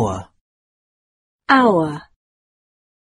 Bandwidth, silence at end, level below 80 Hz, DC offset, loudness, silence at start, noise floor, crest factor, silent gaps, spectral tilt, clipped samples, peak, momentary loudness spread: 11 kHz; 1.05 s; -52 dBFS; under 0.1%; -16 LUFS; 0 s; under -90 dBFS; 20 dB; 0.41-1.39 s; -6 dB/octave; under 0.1%; 0 dBFS; 21 LU